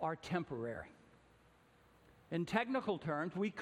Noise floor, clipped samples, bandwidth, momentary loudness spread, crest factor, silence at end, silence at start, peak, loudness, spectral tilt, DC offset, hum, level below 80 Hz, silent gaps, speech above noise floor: -68 dBFS; under 0.1%; 13 kHz; 9 LU; 24 dB; 0 s; 0 s; -18 dBFS; -40 LUFS; -6.5 dB/octave; under 0.1%; none; -72 dBFS; none; 28 dB